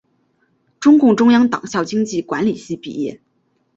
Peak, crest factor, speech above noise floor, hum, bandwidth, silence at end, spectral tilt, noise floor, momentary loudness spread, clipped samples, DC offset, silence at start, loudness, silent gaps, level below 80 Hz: -2 dBFS; 14 dB; 49 dB; none; 8 kHz; 0.6 s; -5.5 dB/octave; -64 dBFS; 15 LU; under 0.1%; under 0.1%; 0.8 s; -16 LUFS; none; -60 dBFS